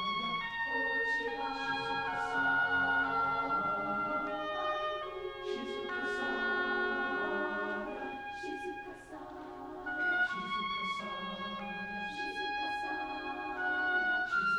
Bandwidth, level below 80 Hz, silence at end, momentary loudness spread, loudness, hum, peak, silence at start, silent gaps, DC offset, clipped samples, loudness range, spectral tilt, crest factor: 11.5 kHz; -62 dBFS; 0 s; 10 LU; -34 LUFS; none; -20 dBFS; 0 s; none; under 0.1%; under 0.1%; 5 LU; -4 dB/octave; 14 dB